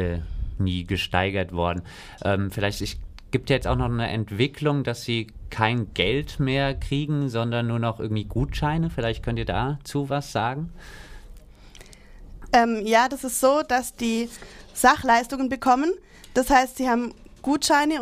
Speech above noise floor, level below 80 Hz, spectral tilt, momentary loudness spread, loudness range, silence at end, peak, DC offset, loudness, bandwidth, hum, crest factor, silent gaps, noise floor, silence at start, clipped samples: 22 dB; -40 dBFS; -5 dB/octave; 12 LU; 5 LU; 0 s; -4 dBFS; under 0.1%; -24 LUFS; 15.5 kHz; none; 20 dB; none; -46 dBFS; 0 s; under 0.1%